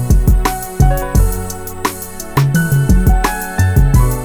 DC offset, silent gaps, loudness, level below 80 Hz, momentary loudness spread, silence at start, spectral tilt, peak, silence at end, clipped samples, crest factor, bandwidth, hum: under 0.1%; none; -15 LUFS; -16 dBFS; 9 LU; 0 s; -6 dB/octave; 0 dBFS; 0 s; under 0.1%; 12 dB; over 20 kHz; none